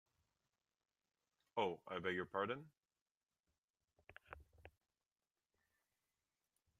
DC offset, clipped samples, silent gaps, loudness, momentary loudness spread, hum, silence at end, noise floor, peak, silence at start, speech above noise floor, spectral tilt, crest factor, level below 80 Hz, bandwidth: under 0.1%; under 0.1%; 3.01-3.21 s, 3.40-3.44 s, 3.58-3.74 s; -44 LUFS; 22 LU; none; 2.1 s; under -90 dBFS; -26 dBFS; 1.55 s; over 46 dB; -6 dB/octave; 26 dB; -80 dBFS; 13.5 kHz